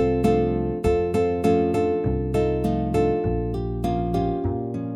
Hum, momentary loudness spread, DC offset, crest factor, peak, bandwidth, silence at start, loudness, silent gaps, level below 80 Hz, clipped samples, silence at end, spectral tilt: none; 6 LU; under 0.1%; 14 dB; -8 dBFS; 13.5 kHz; 0 s; -23 LUFS; none; -34 dBFS; under 0.1%; 0 s; -8.5 dB/octave